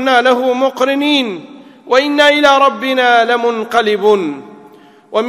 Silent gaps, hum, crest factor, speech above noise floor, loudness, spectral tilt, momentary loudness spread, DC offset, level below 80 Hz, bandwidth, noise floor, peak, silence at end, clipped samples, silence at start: none; none; 12 dB; 30 dB; -12 LUFS; -3.5 dB/octave; 10 LU; under 0.1%; -60 dBFS; 15 kHz; -41 dBFS; 0 dBFS; 0 s; 0.3%; 0 s